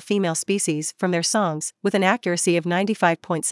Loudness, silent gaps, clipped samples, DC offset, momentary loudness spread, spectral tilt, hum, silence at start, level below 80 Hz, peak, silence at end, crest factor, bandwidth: -22 LUFS; none; under 0.1%; under 0.1%; 4 LU; -4 dB/octave; none; 0 s; -76 dBFS; -4 dBFS; 0 s; 18 dB; 12 kHz